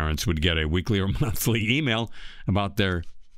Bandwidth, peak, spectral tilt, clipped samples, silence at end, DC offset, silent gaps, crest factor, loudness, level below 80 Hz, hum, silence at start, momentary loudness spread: 16 kHz; -8 dBFS; -5 dB/octave; under 0.1%; 0 s; under 0.1%; none; 18 dB; -25 LUFS; -36 dBFS; none; 0 s; 6 LU